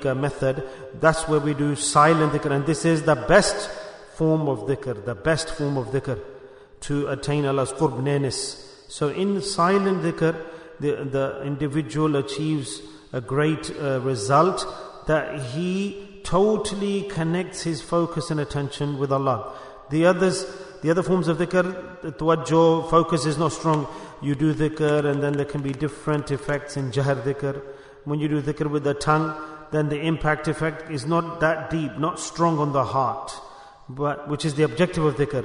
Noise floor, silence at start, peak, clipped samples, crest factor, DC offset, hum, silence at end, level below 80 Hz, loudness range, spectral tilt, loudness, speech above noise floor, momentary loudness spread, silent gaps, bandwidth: -45 dBFS; 0 s; -4 dBFS; under 0.1%; 20 dB; under 0.1%; none; 0 s; -48 dBFS; 5 LU; -5.5 dB/octave; -23 LUFS; 22 dB; 12 LU; none; 11 kHz